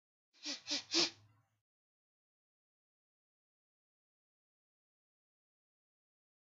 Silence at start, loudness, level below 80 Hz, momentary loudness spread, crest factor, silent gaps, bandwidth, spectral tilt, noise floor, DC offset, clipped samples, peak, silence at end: 0.45 s; -36 LUFS; under -90 dBFS; 12 LU; 28 dB; none; 8 kHz; 0.5 dB/octave; -67 dBFS; under 0.1%; under 0.1%; -20 dBFS; 5.4 s